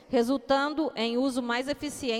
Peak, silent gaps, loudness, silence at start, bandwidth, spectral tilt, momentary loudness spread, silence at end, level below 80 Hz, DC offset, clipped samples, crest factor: -10 dBFS; none; -28 LUFS; 0.1 s; 15.5 kHz; -3.5 dB/octave; 5 LU; 0 s; -60 dBFS; under 0.1%; under 0.1%; 18 dB